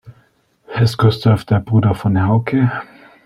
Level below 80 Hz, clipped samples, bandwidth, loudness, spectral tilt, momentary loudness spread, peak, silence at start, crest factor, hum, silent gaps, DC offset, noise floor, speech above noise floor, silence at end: -46 dBFS; under 0.1%; 12 kHz; -16 LUFS; -8 dB/octave; 5 LU; -2 dBFS; 0.05 s; 14 dB; none; none; under 0.1%; -56 dBFS; 42 dB; 0.4 s